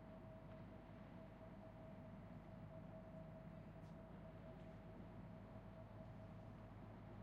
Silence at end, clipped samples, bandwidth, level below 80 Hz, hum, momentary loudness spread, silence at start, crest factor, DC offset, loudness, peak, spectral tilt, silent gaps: 0 s; under 0.1%; 7 kHz; -68 dBFS; none; 2 LU; 0 s; 12 dB; under 0.1%; -59 LUFS; -44 dBFS; -7.5 dB/octave; none